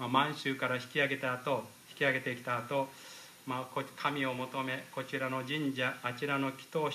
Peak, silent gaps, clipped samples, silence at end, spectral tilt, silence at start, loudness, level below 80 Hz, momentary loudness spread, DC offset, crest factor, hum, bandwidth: -14 dBFS; none; under 0.1%; 0 s; -5 dB/octave; 0 s; -34 LUFS; -82 dBFS; 9 LU; under 0.1%; 22 dB; none; 15.5 kHz